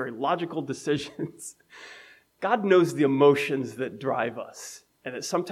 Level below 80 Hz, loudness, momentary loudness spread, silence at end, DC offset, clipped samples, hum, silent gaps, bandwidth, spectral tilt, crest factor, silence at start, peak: -74 dBFS; -26 LUFS; 21 LU; 0 s; under 0.1%; under 0.1%; none; none; 14.5 kHz; -5.5 dB/octave; 18 dB; 0 s; -8 dBFS